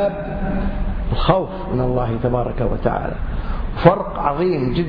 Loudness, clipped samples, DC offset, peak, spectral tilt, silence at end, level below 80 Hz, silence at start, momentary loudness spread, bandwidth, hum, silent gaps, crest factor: -20 LUFS; under 0.1%; under 0.1%; 0 dBFS; -10.5 dB/octave; 0 s; -26 dBFS; 0 s; 10 LU; 5.2 kHz; none; none; 18 dB